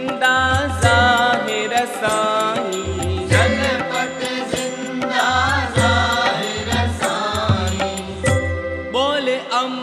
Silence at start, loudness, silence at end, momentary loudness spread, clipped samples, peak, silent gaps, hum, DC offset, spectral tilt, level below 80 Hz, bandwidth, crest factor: 0 s; -18 LUFS; 0 s; 8 LU; under 0.1%; 0 dBFS; none; none; under 0.1%; -4 dB/octave; -38 dBFS; 13.5 kHz; 18 dB